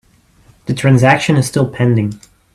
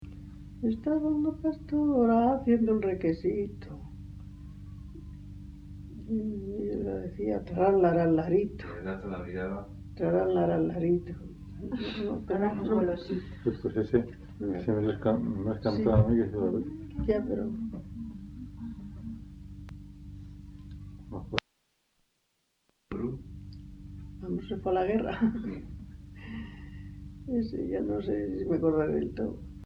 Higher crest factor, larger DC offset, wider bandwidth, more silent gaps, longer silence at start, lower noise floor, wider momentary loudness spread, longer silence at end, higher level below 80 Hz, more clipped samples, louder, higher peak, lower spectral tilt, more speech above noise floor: second, 14 dB vs 26 dB; neither; first, 13.5 kHz vs 6.6 kHz; neither; first, 0.65 s vs 0 s; second, -49 dBFS vs -76 dBFS; second, 13 LU vs 21 LU; first, 0.4 s vs 0 s; about the same, -46 dBFS vs -48 dBFS; neither; first, -13 LUFS vs -30 LUFS; first, 0 dBFS vs -4 dBFS; second, -6.5 dB/octave vs -9 dB/octave; second, 37 dB vs 48 dB